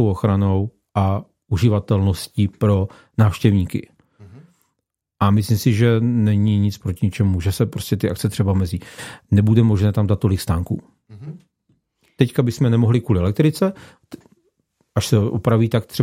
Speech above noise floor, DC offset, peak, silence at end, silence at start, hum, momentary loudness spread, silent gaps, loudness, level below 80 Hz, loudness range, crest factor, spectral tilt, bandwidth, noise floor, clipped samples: 60 dB; under 0.1%; -2 dBFS; 0 s; 0 s; none; 10 LU; none; -19 LUFS; -48 dBFS; 2 LU; 18 dB; -7.5 dB/octave; 15 kHz; -77 dBFS; under 0.1%